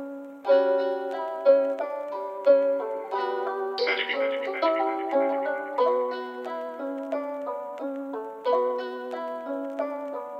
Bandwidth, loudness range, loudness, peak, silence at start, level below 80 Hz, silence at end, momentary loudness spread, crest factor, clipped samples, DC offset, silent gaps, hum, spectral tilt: 6 kHz; 6 LU; -27 LUFS; -8 dBFS; 0 s; under -90 dBFS; 0 s; 12 LU; 18 dB; under 0.1%; under 0.1%; none; none; -4 dB/octave